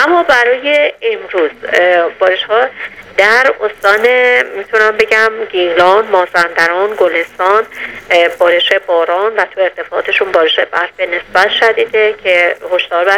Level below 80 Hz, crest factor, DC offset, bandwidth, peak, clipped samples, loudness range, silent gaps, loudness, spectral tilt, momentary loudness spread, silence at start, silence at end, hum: -52 dBFS; 12 dB; under 0.1%; 16 kHz; 0 dBFS; 0.3%; 2 LU; none; -11 LUFS; -2.5 dB/octave; 7 LU; 0 s; 0 s; none